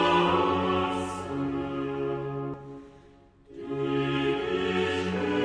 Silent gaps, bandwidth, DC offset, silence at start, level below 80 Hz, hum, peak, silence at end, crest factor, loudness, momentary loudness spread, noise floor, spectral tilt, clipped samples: none; 10.5 kHz; under 0.1%; 0 s; -54 dBFS; none; -12 dBFS; 0 s; 16 dB; -28 LUFS; 15 LU; -55 dBFS; -6 dB/octave; under 0.1%